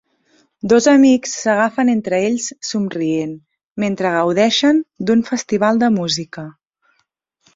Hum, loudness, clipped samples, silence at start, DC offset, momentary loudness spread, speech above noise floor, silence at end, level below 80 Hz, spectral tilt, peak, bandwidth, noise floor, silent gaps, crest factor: none; -16 LUFS; under 0.1%; 0.65 s; under 0.1%; 16 LU; 52 dB; 1.05 s; -58 dBFS; -4.5 dB/octave; -2 dBFS; 7.8 kHz; -67 dBFS; 3.72-3.76 s; 14 dB